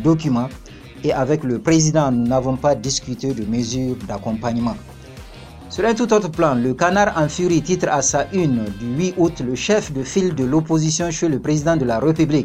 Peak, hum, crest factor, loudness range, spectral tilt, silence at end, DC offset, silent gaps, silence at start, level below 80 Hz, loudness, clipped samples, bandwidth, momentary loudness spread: -2 dBFS; none; 16 dB; 4 LU; -5 dB/octave; 0 s; under 0.1%; none; 0 s; -42 dBFS; -19 LUFS; under 0.1%; 13 kHz; 9 LU